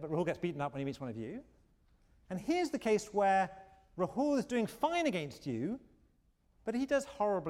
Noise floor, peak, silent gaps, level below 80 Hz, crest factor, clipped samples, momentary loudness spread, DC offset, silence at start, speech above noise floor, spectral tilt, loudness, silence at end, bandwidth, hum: -72 dBFS; -20 dBFS; none; -66 dBFS; 16 dB; under 0.1%; 13 LU; under 0.1%; 0 s; 37 dB; -5.5 dB/octave; -35 LUFS; 0 s; 16 kHz; none